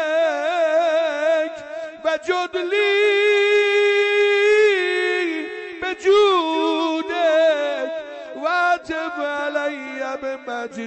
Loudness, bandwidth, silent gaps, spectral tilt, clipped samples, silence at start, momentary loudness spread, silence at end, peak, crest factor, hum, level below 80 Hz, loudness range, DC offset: -19 LUFS; 8.6 kHz; none; -2 dB/octave; under 0.1%; 0 s; 12 LU; 0 s; -8 dBFS; 10 dB; none; -64 dBFS; 5 LU; under 0.1%